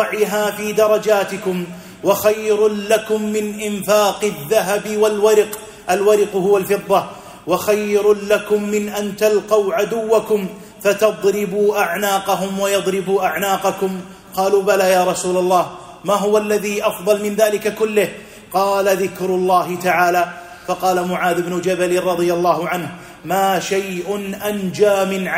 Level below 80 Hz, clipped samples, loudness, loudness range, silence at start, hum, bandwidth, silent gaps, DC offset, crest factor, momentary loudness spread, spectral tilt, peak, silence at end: -56 dBFS; under 0.1%; -17 LUFS; 2 LU; 0 s; none; 16 kHz; none; under 0.1%; 14 dB; 8 LU; -4.5 dB/octave; -2 dBFS; 0 s